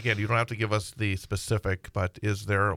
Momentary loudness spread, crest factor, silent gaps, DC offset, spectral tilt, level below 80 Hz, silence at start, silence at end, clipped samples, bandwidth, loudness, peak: 6 LU; 18 dB; none; under 0.1%; -5.5 dB/octave; -50 dBFS; 0 s; 0 s; under 0.1%; 15 kHz; -29 LUFS; -10 dBFS